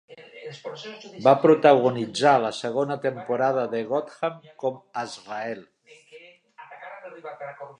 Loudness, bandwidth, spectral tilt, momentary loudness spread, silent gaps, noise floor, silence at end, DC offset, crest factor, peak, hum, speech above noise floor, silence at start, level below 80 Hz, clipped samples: -23 LUFS; 10.5 kHz; -5.5 dB/octave; 22 LU; none; -50 dBFS; 0.1 s; under 0.1%; 22 dB; -2 dBFS; none; 27 dB; 0.1 s; -78 dBFS; under 0.1%